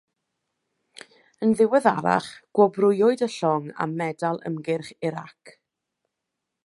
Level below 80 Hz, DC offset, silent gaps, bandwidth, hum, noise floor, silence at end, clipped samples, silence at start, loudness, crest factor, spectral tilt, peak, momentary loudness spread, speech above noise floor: -70 dBFS; under 0.1%; none; 11.5 kHz; none; -83 dBFS; 1.15 s; under 0.1%; 1.4 s; -23 LUFS; 22 dB; -6.5 dB/octave; -4 dBFS; 11 LU; 60 dB